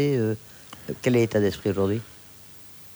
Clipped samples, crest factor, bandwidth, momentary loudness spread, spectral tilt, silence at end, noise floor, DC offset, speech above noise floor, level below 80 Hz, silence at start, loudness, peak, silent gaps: under 0.1%; 16 dB; over 20 kHz; 22 LU; -7 dB/octave; 0 s; -47 dBFS; under 0.1%; 23 dB; -58 dBFS; 0 s; -25 LUFS; -10 dBFS; none